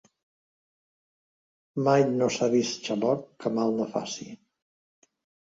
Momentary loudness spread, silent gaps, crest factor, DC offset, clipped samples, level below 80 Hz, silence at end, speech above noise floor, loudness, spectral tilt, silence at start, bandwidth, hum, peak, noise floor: 14 LU; none; 20 dB; under 0.1%; under 0.1%; -72 dBFS; 1.15 s; over 64 dB; -26 LUFS; -5.5 dB/octave; 1.75 s; 7.8 kHz; none; -8 dBFS; under -90 dBFS